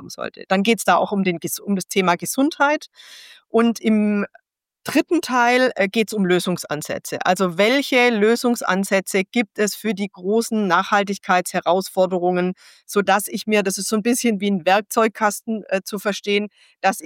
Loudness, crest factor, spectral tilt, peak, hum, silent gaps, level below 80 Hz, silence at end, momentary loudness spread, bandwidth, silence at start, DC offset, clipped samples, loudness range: -20 LUFS; 16 dB; -4.5 dB/octave; -4 dBFS; none; none; -70 dBFS; 0 s; 8 LU; 17 kHz; 0 s; under 0.1%; under 0.1%; 2 LU